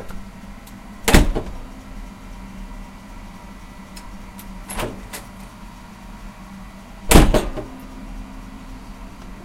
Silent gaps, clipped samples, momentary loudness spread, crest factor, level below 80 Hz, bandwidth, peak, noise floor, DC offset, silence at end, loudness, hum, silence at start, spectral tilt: none; under 0.1%; 23 LU; 22 dB; -26 dBFS; 16.5 kHz; 0 dBFS; -38 dBFS; under 0.1%; 0 s; -19 LUFS; none; 0 s; -4.5 dB/octave